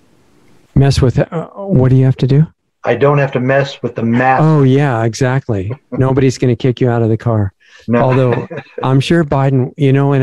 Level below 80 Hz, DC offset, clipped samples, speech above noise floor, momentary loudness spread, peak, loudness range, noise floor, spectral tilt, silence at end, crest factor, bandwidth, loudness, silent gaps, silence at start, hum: -38 dBFS; 0.5%; under 0.1%; 38 dB; 9 LU; 0 dBFS; 2 LU; -50 dBFS; -7.5 dB/octave; 0 s; 12 dB; 11 kHz; -13 LUFS; none; 0.75 s; none